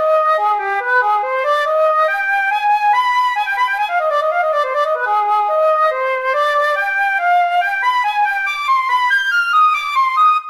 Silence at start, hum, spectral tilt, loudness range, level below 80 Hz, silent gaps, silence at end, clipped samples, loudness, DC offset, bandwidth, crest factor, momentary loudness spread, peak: 0 s; none; 0.5 dB/octave; 1 LU; -62 dBFS; none; 0 s; under 0.1%; -15 LUFS; under 0.1%; 15.5 kHz; 10 dB; 3 LU; -6 dBFS